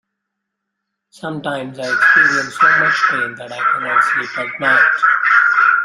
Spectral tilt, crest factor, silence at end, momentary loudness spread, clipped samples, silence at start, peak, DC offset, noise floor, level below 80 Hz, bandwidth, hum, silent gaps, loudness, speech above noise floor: -3.5 dB/octave; 14 dB; 0 s; 13 LU; under 0.1%; 1.25 s; -2 dBFS; under 0.1%; -77 dBFS; -66 dBFS; 12 kHz; none; none; -13 LUFS; 62 dB